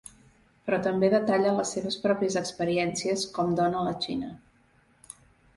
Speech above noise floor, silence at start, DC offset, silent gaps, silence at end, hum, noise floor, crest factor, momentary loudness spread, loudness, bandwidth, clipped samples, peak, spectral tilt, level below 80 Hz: 36 dB; 0.65 s; under 0.1%; none; 1.2 s; none; -63 dBFS; 18 dB; 16 LU; -27 LUFS; 11.5 kHz; under 0.1%; -10 dBFS; -4.5 dB/octave; -62 dBFS